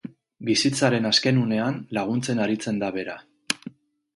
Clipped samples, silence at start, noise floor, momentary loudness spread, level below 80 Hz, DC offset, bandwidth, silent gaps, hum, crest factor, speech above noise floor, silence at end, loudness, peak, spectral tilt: under 0.1%; 0.05 s; -44 dBFS; 15 LU; -64 dBFS; under 0.1%; 11.5 kHz; none; none; 24 dB; 21 dB; 0.45 s; -24 LUFS; -2 dBFS; -4.5 dB/octave